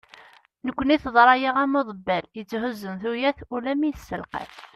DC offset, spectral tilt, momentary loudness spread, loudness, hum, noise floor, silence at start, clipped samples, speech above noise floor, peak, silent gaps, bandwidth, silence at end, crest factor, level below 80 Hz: under 0.1%; -6 dB/octave; 16 LU; -23 LUFS; none; -52 dBFS; 0.65 s; under 0.1%; 29 dB; -4 dBFS; none; 13.5 kHz; 0.1 s; 22 dB; -54 dBFS